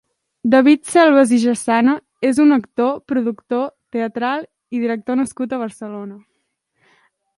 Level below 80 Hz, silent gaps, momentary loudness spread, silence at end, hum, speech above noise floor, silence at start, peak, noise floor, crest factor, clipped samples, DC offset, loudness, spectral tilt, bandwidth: -64 dBFS; none; 14 LU; 1.2 s; none; 55 dB; 0.45 s; 0 dBFS; -71 dBFS; 18 dB; under 0.1%; under 0.1%; -17 LUFS; -4.5 dB/octave; 11.5 kHz